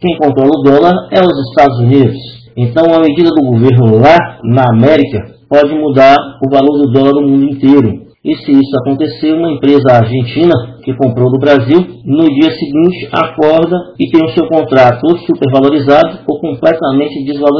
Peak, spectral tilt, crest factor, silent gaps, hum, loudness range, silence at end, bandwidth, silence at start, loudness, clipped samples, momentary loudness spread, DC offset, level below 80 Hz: 0 dBFS; -9 dB/octave; 8 dB; none; none; 2 LU; 0 s; 6 kHz; 0 s; -9 LUFS; 4%; 7 LU; under 0.1%; -44 dBFS